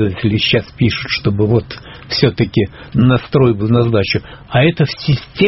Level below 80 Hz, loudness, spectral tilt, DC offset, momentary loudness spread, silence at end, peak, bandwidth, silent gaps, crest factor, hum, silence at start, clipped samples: -38 dBFS; -15 LUFS; -5.5 dB/octave; under 0.1%; 6 LU; 0 s; 0 dBFS; 6 kHz; none; 14 dB; none; 0 s; under 0.1%